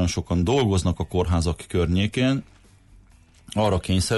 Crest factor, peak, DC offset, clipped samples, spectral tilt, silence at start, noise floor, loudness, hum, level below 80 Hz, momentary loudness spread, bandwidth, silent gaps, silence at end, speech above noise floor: 12 dB; -10 dBFS; under 0.1%; under 0.1%; -6 dB/octave; 0 s; -53 dBFS; -23 LUFS; none; -36 dBFS; 5 LU; 11.5 kHz; none; 0 s; 31 dB